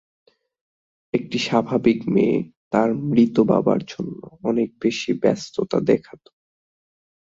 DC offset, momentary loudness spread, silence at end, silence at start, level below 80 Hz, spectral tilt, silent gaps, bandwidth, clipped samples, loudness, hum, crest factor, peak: under 0.1%; 9 LU; 1.3 s; 1.15 s; -60 dBFS; -6.5 dB/octave; 2.57-2.71 s; 7.8 kHz; under 0.1%; -21 LUFS; none; 18 dB; -4 dBFS